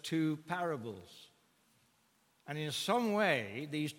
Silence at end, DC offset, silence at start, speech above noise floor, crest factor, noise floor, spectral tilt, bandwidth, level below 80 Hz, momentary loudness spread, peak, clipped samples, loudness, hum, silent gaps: 0 s; under 0.1%; 0.05 s; 37 dB; 22 dB; -73 dBFS; -5 dB/octave; 17 kHz; -82 dBFS; 15 LU; -16 dBFS; under 0.1%; -35 LUFS; none; none